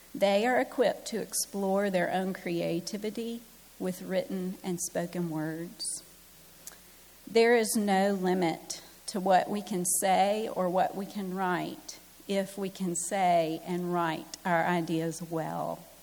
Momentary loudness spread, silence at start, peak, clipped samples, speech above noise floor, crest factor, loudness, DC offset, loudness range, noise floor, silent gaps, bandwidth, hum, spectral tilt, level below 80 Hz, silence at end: 12 LU; 0.15 s; -12 dBFS; under 0.1%; 25 dB; 18 dB; -30 LUFS; under 0.1%; 7 LU; -54 dBFS; none; 19.5 kHz; none; -4.5 dB/octave; -68 dBFS; 0.05 s